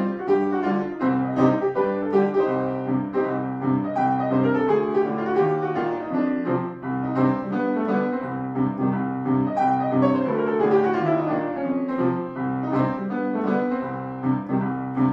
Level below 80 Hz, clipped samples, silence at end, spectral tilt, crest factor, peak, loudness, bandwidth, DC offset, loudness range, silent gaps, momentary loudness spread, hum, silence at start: -62 dBFS; under 0.1%; 0 s; -9.5 dB/octave; 16 dB; -6 dBFS; -23 LUFS; 6 kHz; under 0.1%; 2 LU; none; 6 LU; none; 0 s